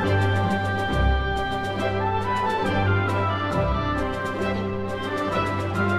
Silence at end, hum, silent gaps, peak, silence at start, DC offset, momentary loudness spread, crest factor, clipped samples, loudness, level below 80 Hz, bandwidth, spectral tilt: 0 s; none; none; -10 dBFS; 0 s; under 0.1%; 4 LU; 14 dB; under 0.1%; -24 LUFS; -34 dBFS; 11.5 kHz; -7 dB/octave